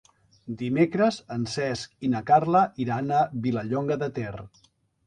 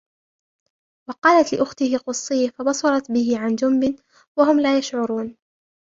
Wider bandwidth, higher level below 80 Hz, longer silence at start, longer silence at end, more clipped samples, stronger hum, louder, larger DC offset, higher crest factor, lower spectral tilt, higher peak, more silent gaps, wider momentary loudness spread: first, 10.5 kHz vs 7.8 kHz; about the same, -60 dBFS vs -62 dBFS; second, 0.45 s vs 1.1 s; about the same, 0.6 s vs 0.65 s; neither; neither; second, -25 LUFS vs -20 LUFS; neither; about the same, 18 dB vs 18 dB; first, -6.5 dB/octave vs -3.5 dB/octave; second, -6 dBFS vs -2 dBFS; second, none vs 1.18-1.22 s, 4.27-4.35 s; about the same, 12 LU vs 11 LU